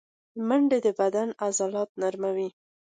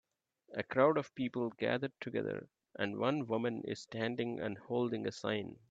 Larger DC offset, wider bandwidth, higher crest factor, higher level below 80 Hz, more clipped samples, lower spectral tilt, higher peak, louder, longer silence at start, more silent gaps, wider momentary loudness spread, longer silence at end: neither; first, 9.6 kHz vs 8 kHz; second, 14 dB vs 22 dB; about the same, -78 dBFS vs -78 dBFS; neither; second, -4.5 dB/octave vs -6.5 dB/octave; about the same, -12 dBFS vs -14 dBFS; first, -27 LUFS vs -37 LUFS; second, 0.35 s vs 0.5 s; first, 1.89-1.95 s vs none; about the same, 10 LU vs 11 LU; first, 0.5 s vs 0.15 s